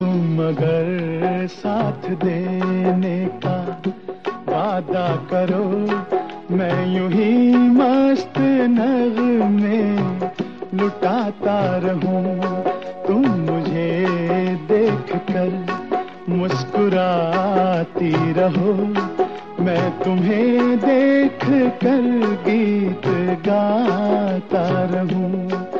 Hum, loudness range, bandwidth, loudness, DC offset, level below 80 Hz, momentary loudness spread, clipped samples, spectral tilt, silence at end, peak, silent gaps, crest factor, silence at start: none; 5 LU; 7 kHz; -19 LUFS; 0.5%; -62 dBFS; 7 LU; under 0.1%; -8.5 dB/octave; 0 s; -4 dBFS; none; 14 dB; 0 s